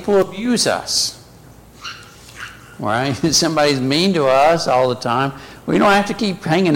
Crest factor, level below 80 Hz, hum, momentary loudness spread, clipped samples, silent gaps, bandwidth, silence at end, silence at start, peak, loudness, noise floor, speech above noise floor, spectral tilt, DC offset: 12 dB; -48 dBFS; none; 19 LU; under 0.1%; none; 17 kHz; 0 s; 0 s; -6 dBFS; -16 LUFS; -43 dBFS; 27 dB; -4 dB/octave; under 0.1%